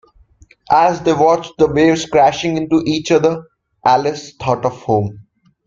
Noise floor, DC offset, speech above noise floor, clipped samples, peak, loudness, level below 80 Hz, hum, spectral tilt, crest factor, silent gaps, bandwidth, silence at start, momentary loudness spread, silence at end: -49 dBFS; under 0.1%; 34 dB; under 0.1%; 0 dBFS; -15 LUFS; -48 dBFS; none; -5.5 dB/octave; 16 dB; none; 7.6 kHz; 0.7 s; 7 LU; 0.45 s